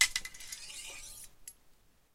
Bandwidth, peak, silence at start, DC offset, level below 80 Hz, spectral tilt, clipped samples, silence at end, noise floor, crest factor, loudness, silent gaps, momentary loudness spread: 16.5 kHz; -8 dBFS; 0 s; under 0.1%; -58 dBFS; 2.5 dB/octave; under 0.1%; 0.45 s; -64 dBFS; 30 dB; -39 LUFS; none; 16 LU